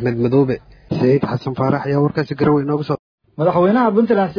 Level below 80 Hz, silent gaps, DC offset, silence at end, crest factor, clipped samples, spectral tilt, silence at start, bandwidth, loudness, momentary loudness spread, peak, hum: -50 dBFS; 2.99-3.18 s; under 0.1%; 0 s; 14 dB; under 0.1%; -10 dB/octave; 0 s; 5.4 kHz; -17 LUFS; 8 LU; -2 dBFS; none